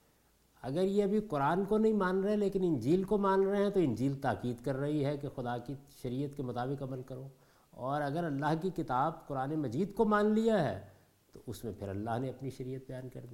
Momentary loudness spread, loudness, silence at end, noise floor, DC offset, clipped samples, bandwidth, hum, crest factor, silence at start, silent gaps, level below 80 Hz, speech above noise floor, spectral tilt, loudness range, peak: 14 LU; -33 LUFS; 0 s; -69 dBFS; under 0.1%; under 0.1%; 16.5 kHz; none; 16 dB; 0.65 s; none; -60 dBFS; 36 dB; -7.5 dB/octave; 7 LU; -16 dBFS